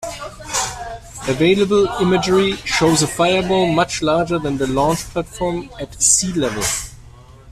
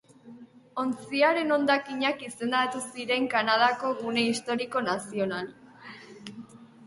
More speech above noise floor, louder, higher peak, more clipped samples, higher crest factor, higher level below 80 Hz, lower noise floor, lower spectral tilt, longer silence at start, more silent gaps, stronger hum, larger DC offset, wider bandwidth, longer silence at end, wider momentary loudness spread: about the same, 24 dB vs 23 dB; first, -17 LUFS vs -27 LUFS; first, 0 dBFS vs -10 dBFS; neither; about the same, 18 dB vs 20 dB; first, -40 dBFS vs -72 dBFS; second, -41 dBFS vs -50 dBFS; about the same, -3.5 dB/octave vs -3.5 dB/octave; second, 0 s vs 0.25 s; neither; neither; neither; first, 14.5 kHz vs 11.5 kHz; about the same, 0 s vs 0 s; second, 13 LU vs 21 LU